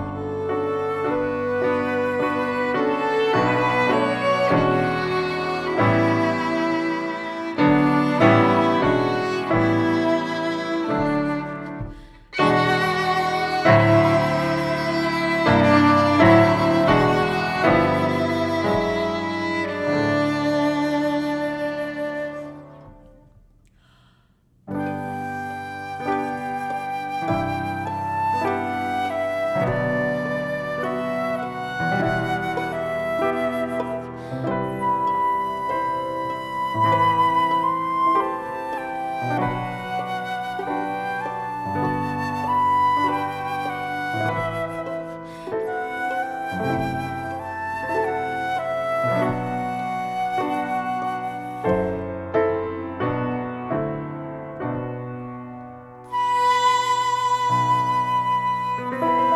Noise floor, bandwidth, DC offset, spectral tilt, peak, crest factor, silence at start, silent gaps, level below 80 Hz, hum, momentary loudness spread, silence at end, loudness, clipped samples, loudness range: -59 dBFS; 14.5 kHz; under 0.1%; -6.5 dB/octave; 0 dBFS; 22 dB; 0 s; none; -50 dBFS; none; 11 LU; 0 s; -22 LUFS; under 0.1%; 9 LU